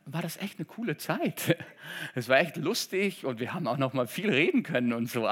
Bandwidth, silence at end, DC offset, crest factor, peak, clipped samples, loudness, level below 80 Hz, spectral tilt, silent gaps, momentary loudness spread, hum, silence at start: 17 kHz; 0 s; under 0.1%; 22 dB; -6 dBFS; under 0.1%; -29 LUFS; -84 dBFS; -5 dB/octave; none; 11 LU; none; 0.05 s